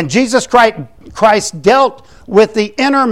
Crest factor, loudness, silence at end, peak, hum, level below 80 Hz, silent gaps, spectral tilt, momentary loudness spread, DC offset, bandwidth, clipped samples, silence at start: 12 dB; -11 LUFS; 0 s; 0 dBFS; none; -46 dBFS; none; -4 dB/octave; 4 LU; 0.8%; 15.5 kHz; under 0.1%; 0 s